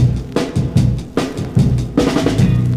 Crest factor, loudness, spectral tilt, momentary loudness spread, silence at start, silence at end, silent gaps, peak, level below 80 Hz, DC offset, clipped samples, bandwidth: 14 dB; -16 LUFS; -7.5 dB/octave; 6 LU; 0 s; 0 s; none; 0 dBFS; -28 dBFS; 0.2%; under 0.1%; 13 kHz